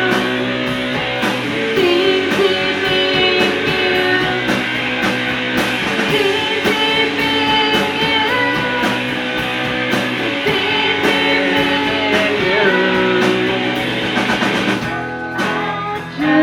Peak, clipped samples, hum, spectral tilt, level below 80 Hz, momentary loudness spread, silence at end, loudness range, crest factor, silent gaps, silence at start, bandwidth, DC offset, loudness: 0 dBFS; under 0.1%; none; -4.5 dB/octave; -46 dBFS; 5 LU; 0 s; 2 LU; 16 dB; none; 0 s; 18 kHz; under 0.1%; -15 LUFS